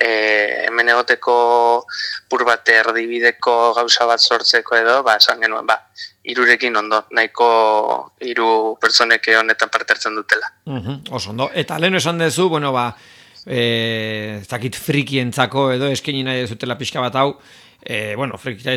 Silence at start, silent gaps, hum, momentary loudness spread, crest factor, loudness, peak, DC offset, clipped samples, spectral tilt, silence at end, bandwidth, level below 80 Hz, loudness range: 0 s; none; none; 12 LU; 18 dB; -16 LUFS; 0 dBFS; under 0.1%; under 0.1%; -3.5 dB/octave; 0 s; 17.5 kHz; -62 dBFS; 6 LU